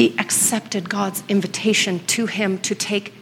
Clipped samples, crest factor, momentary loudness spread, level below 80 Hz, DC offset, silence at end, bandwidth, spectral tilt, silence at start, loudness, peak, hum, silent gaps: under 0.1%; 20 dB; 6 LU; -66 dBFS; under 0.1%; 0 s; 17 kHz; -3 dB/octave; 0 s; -20 LUFS; -2 dBFS; none; none